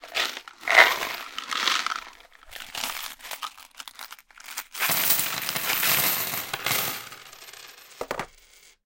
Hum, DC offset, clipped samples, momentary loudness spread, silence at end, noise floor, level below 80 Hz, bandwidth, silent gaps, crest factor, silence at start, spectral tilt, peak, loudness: none; under 0.1%; under 0.1%; 22 LU; 0.55 s; -55 dBFS; -62 dBFS; 17 kHz; none; 28 dB; 0 s; 0 dB/octave; 0 dBFS; -24 LUFS